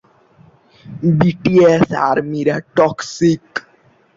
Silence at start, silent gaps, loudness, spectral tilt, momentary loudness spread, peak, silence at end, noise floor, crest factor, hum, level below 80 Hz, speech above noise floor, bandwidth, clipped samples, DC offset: 0.85 s; none; -15 LUFS; -7 dB/octave; 11 LU; -2 dBFS; 0.55 s; -53 dBFS; 14 dB; none; -50 dBFS; 38 dB; 7.8 kHz; under 0.1%; under 0.1%